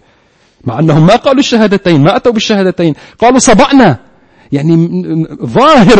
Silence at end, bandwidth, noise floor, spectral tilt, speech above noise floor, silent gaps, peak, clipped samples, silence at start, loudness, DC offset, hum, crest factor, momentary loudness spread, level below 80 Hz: 0 s; 11 kHz; -49 dBFS; -5.5 dB/octave; 42 dB; none; 0 dBFS; 1%; 0.65 s; -8 LUFS; under 0.1%; none; 8 dB; 10 LU; -34 dBFS